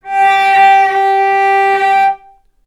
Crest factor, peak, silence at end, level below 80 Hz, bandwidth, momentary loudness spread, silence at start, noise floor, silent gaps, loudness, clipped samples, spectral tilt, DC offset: 10 dB; 0 dBFS; 0.5 s; -58 dBFS; 11.5 kHz; 5 LU; 0.05 s; -44 dBFS; none; -10 LUFS; under 0.1%; -2 dB/octave; under 0.1%